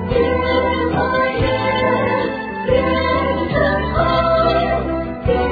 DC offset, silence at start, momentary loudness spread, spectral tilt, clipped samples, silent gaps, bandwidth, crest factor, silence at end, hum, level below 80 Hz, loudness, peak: under 0.1%; 0 s; 5 LU; -8.5 dB/octave; under 0.1%; none; 4.9 kHz; 14 dB; 0 s; none; -30 dBFS; -17 LUFS; -4 dBFS